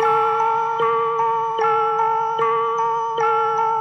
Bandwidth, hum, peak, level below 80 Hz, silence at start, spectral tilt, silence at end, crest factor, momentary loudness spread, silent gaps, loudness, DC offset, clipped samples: 6.6 kHz; none; -6 dBFS; -70 dBFS; 0 s; -4 dB/octave; 0 s; 12 dB; 2 LU; none; -19 LUFS; under 0.1%; under 0.1%